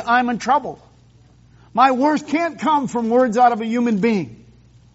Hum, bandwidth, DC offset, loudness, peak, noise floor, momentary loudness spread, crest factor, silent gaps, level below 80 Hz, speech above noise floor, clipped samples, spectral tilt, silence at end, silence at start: none; 8 kHz; under 0.1%; -18 LUFS; -2 dBFS; -50 dBFS; 8 LU; 18 dB; none; -56 dBFS; 33 dB; under 0.1%; -4 dB/octave; 0.6 s; 0 s